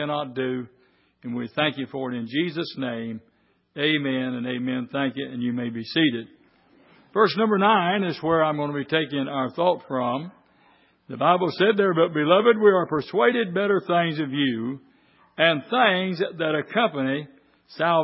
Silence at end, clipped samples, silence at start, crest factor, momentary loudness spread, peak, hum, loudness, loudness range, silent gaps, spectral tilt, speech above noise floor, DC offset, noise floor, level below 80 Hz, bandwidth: 0 s; under 0.1%; 0 s; 20 dB; 12 LU; -4 dBFS; none; -23 LUFS; 7 LU; none; -10 dB/octave; 37 dB; under 0.1%; -59 dBFS; -68 dBFS; 5.8 kHz